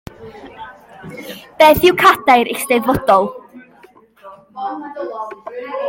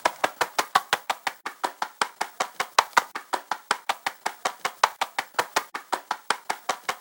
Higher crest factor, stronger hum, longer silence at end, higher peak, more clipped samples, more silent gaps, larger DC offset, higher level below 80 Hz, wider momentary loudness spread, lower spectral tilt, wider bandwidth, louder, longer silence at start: second, 16 dB vs 28 dB; neither; about the same, 0 s vs 0 s; about the same, 0 dBFS vs 0 dBFS; neither; neither; neither; first, -46 dBFS vs -80 dBFS; first, 26 LU vs 8 LU; first, -4 dB/octave vs 0 dB/octave; second, 17 kHz vs over 20 kHz; first, -13 LUFS vs -27 LUFS; first, 0.2 s vs 0.05 s